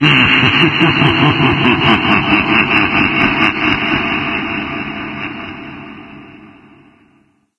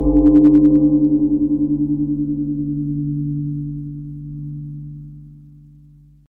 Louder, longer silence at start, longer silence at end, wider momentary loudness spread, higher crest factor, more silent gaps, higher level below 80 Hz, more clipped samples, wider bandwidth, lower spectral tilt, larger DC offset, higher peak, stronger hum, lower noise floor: first, -12 LUFS vs -16 LUFS; about the same, 0 s vs 0 s; first, 1.15 s vs 0.95 s; second, 16 LU vs 20 LU; about the same, 14 dB vs 14 dB; neither; second, -40 dBFS vs -34 dBFS; neither; first, 10 kHz vs 1.8 kHz; second, -6 dB/octave vs -12.5 dB/octave; neither; about the same, 0 dBFS vs -2 dBFS; neither; first, -54 dBFS vs -46 dBFS